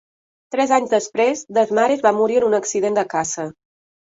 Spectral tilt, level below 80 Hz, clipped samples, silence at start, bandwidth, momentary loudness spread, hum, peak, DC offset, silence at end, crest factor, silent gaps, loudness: -3.5 dB/octave; -64 dBFS; under 0.1%; 0.5 s; 8 kHz; 8 LU; none; -2 dBFS; under 0.1%; 0.6 s; 16 dB; none; -19 LUFS